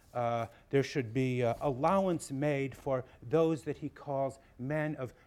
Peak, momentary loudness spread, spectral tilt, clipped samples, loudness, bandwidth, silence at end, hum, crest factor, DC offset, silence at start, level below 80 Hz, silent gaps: -16 dBFS; 8 LU; -7 dB/octave; under 0.1%; -33 LUFS; 14.5 kHz; 0.15 s; none; 18 dB; under 0.1%; 0.15 s; -62 dBFS; none